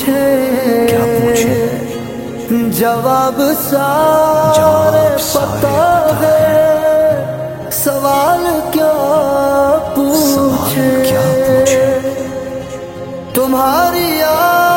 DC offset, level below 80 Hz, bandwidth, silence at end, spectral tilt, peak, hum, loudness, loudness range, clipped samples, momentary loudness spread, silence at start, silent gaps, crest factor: under 0.1%; -40 dBFS; 17 kHz; 0 s; -5 dB/octave; 0 dBFS; none; -12 LUFS; 3 LU; under 0.1%; 11 LU; 0 s; none; 12 dB